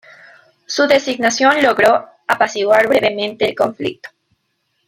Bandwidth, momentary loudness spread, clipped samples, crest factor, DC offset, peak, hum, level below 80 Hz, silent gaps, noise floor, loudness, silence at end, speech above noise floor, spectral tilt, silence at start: 16 kHz; 10 LU; under 0.1%; 16 dB; under 0.1%; -2 dBFS; none; -58 dBFS; none; -68 dBFS; -15 LUFS; 0.8 s; 53 dB; -3 dB/octave; 0.7 s